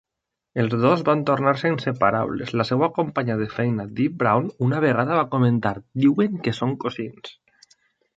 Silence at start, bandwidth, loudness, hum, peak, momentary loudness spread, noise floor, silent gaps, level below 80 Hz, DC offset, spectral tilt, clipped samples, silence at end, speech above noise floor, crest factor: 0.55 s; 7.8 kHz; -22 LUFS; none; -4 dBFS; 8 LU; -83 dBFS; none; -58 dBFS; under 0.1%; -8 dB/octave; under 0.1%; 0.85 s; 62 dB; 20 dB